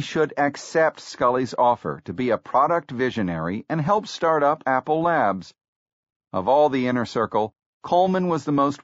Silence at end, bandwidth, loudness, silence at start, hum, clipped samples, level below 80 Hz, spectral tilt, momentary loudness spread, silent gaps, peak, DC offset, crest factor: 0.05 s; 8 kHz; -22 LUFS; 0 s; none; under 0.1%; -60 dBFS; -5 dB/octave; 7 LU; 5.68-5.86 s, 5.93-6.03 s, 6.16-6.20 s, 7.66-7.81 s; -8 dBFS; under 0.1%; 16 dB